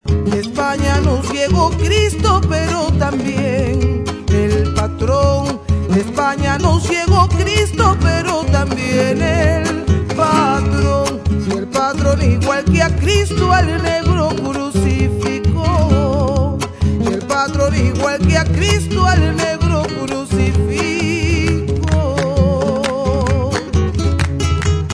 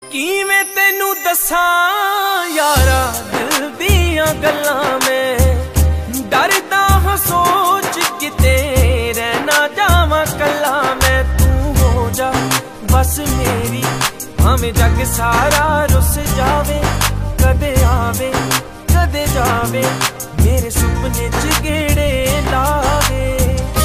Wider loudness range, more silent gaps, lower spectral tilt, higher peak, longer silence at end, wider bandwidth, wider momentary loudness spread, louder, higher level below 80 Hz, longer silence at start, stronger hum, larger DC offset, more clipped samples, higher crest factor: about the same, 2 LU vs 2 LU; neither; first, -6 dB/octave vs -4 dB/octave; about the same, 0 dBFS vs 0 dBFS; about the same, 0 s vs 0 s; second, 11 kHz vs 15.5 kHz; about the same, 4 LU vs 4 LU; about the same, -15 LUFS vs -14 LUFS; about the same, -24 dBFS vs -20 dBFS; about the same, 0.05 s vs 0 s; neither; neither; neither; about the same, 14 dB vs 14 dB